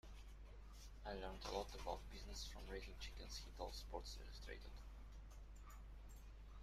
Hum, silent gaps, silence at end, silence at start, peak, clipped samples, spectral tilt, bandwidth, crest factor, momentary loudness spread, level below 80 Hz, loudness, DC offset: none; none; 0 s; 0.05 s; -30 dBFS; under 0.1%; -4 dB/octave; 15.5 kHz; 22 dB; 13 LU; -56 dBFS; -54 LUFS; under 0.1%